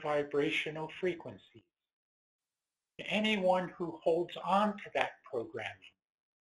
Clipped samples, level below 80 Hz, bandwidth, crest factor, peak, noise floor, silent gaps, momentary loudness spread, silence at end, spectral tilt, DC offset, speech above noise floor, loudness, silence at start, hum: under 0.1%; -74 dBFS; 11.5 kHz; 24 dB; -12 dBFS; under -90 dBFS; 1.93-2.39 s; 12 LU; 0.55 s; -5.5 dB/octave; under 0.1%; over 56 dB; -34 LUFS; 0 s; none